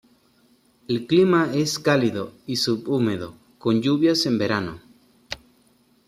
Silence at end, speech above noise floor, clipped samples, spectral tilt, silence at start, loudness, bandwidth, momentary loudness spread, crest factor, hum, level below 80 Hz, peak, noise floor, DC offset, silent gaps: 0.75 s; 39 dB; under 0.1%; -5 dB/octave; 0.9 s; -22 LUFS; 15 kHz; 17 LU; 18 dB; none; -60 dBFS; -4 dBFS; -60 dBFS; under 0.1%; none